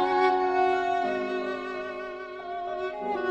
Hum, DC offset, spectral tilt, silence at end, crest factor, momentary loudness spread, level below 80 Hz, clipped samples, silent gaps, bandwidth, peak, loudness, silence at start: none; under 0.1%; -5 dB/octave; 0 s; 14 dB; 13 LU; -62 dBFS; under 0.1%; none; 8.2 kHz; -12 dBFS; -28 LUFS; 0 s